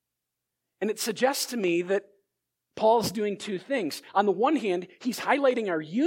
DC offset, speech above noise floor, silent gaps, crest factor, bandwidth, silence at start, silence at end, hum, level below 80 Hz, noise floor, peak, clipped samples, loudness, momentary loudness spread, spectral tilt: under 0.1%; 59 dB; none; 18 dB; 17 kHz; 0.8 s; 0 s; none; -70 dBFS; -85 dBFS; -8 dBFS; under 0.1%; -27 LUFS; 8 LU; -4 dB/octave